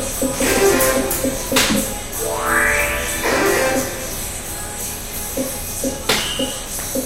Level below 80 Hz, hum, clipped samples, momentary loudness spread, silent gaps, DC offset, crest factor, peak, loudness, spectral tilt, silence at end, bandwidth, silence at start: -34 dBFS; none; under 0.1%; 10 LU; none; under 0.1%; 20 dB; 0 dBFS; -18 LUFS; -2.5 dB/octave; 0 s; 16 kHz; 0 s